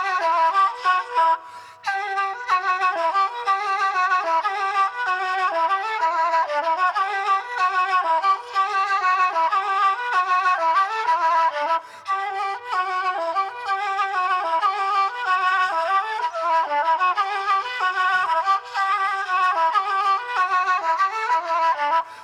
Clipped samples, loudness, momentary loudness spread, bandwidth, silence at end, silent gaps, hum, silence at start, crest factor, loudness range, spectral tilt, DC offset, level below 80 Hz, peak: under 0.1%; -21 LUFS; 5 LU; 11 kHz; 0 s; none; none; 0 s; 12 dB; 2 LU; -0.5 dB/octave; under 0.1%; -88 dBFS; -8 dBFS